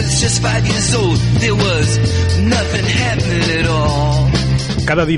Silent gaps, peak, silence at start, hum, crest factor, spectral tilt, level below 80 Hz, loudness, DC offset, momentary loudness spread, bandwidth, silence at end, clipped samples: none; -2 dBFS; 0 s; none; 12 dB; -4.5 dB/octave; -26 dBFS; -14 LUFS; under 0.1%; 2 LU; 11.5 kHz; 0 s; under 0.1%